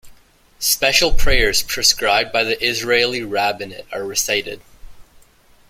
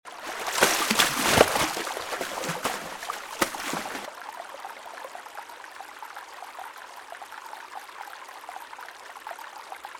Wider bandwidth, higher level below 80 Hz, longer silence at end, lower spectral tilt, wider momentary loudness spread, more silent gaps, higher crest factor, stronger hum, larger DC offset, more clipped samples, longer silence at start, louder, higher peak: second, 16.5 kHz vs 19 kHz; first, -28 dBFS vs -58 dBFS; first, 0.7 s vs 0 s; about the same, -1.5 dB/octave vs -2 dB/octave; second, 13 LU vs 20 LU; neither; second, 18 dB vs 28 dB; neither; neither; neither; about the same, 0.05 s vs 0.05 s; first, -17 LUFS vs -25 LUFS; about the same, 0 dBFS vs -2 dBFS